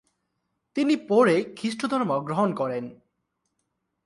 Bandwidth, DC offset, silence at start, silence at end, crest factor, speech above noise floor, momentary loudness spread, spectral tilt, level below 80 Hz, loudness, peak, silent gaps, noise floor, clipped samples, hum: 11.5 kHz; under 0.1%; 0.75 s; 1.1 s; 20 dB; 54 dB; 13 LU; -6 dB/octave; -72 dBFS; -25 LUFS; -8 dBFS; none; -78 dBFS; under 0.1%; none